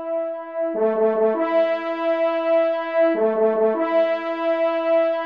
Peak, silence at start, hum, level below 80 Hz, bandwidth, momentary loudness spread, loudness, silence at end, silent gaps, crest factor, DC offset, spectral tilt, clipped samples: -8 dBFS; 0 s; none; -76 dBFS; 5.2 kHz; 5 LU; -21 LUFS; 0 s; none; 12 dB; 0.1%; -7 dB/octave; under 0.1%